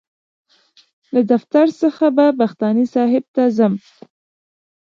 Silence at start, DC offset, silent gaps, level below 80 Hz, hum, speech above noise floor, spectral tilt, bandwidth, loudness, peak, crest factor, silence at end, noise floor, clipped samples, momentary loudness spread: 1.15 s; under 0.1%; 3.28-3.34 s; -70 dBFS; none; 39 dB; -8 dB/octave; 7.2 kHz; -16 LUFS; -2 dBFS; 16 dB; 1.15 s; -55 dBFS; under 0.1%; 4 LU